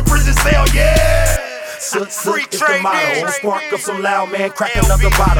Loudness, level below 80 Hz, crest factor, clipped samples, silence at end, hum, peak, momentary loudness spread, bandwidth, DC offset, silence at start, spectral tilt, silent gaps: -15 LUFS; -18 dBFS; 12 dB; under 0.1%; 0 s; none; 0 dBFS; 8 LU; 18.5 kHz; under 0.1%; 0 s; -4 dB/octave; none